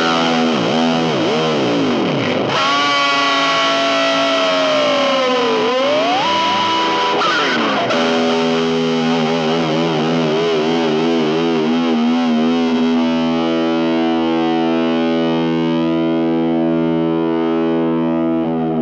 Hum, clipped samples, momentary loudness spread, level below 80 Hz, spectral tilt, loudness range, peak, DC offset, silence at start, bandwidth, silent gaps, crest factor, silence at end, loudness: none; under 0.1%; 3 LU; -58 dBFS; -5 dB/octave; 2 LU; -4 dBFS; under 0.1%; 0 s; 8.2 kHz; none; 12 dB; 0 s; -15 LUFS